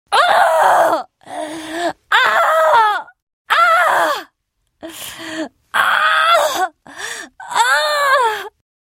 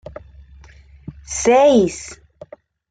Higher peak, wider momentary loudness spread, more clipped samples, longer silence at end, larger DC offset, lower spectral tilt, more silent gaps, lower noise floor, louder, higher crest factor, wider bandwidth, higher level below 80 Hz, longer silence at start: first, 0 dBFS vs -4 dBFS; second, 17 LU vs 27 LU; neither; second, 0.35 s vs 0.75 s; neither; second, -0.5 dB/octave vs -4.5 dB/octave; first, 3.22-3.27 s, 3.33-3.45 s vs none; first, -69 dBFS vs -45 dBFS; about the same, -14 LUFS vs -15 LUFS; about the same, 16 dB vs 16 dB; first, 16.5 kHz vs 9.4 kHz; second, -64 dBFS vs -46 dBFS; second, 0.1 s vs 1.1 s